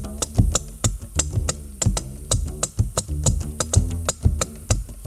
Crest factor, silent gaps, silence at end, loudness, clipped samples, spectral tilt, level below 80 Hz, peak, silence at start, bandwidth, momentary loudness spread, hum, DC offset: 20 dB; none; 0 s; -24 LUFS; under 0.1%; -4 dB/octave; -28 dBFS; -2 dBFS; 0 s; 15.5 kHz; 5 LU; none; under 0.1%